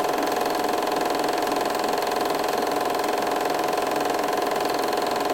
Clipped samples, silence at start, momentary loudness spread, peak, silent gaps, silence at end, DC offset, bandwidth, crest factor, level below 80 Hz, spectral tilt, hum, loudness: under 0.1%; 0 s; 0 LU; -10 dBFS; none; 0 s; 0.1%; 17 kHz; 14 dB; -60 dBFS; -3 dB/octave; none; -24 LUFS